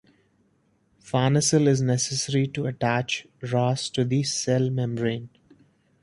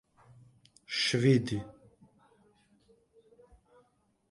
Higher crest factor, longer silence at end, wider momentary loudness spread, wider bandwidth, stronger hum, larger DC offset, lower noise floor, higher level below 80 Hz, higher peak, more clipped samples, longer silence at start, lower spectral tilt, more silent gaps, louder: about the same, 18 dB vs 22 dB; second, 0.75 s vs 2.6 s; second, 8 LU vs 13 LU; about the same, 11.5 kHz vs 11.5 kHz; neither; neither; second, -66 dBFS vs -71 dBFS; first, -60 dBFS vs -66 dBFS; first, -8 dBFS vs -12 dBFS; neither; first, 1.05 s vs 0.9 s; about the same, -5 dB/octave vs -5.5 dB/octave; neither; first, -24 LUFS vs -29 LUFS